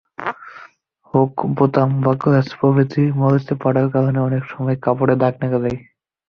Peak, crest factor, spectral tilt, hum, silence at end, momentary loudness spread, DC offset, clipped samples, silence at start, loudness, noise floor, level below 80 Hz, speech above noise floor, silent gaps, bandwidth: -2 dBFS; 16 dB; -10 dB/octave; none; 0.5 s; 10 LU; under 0.1%; under 0.1%; 0.2 s; -18 LUFS; -50 dBFS; -54 dBFS; 33 dB; none; 6 kHz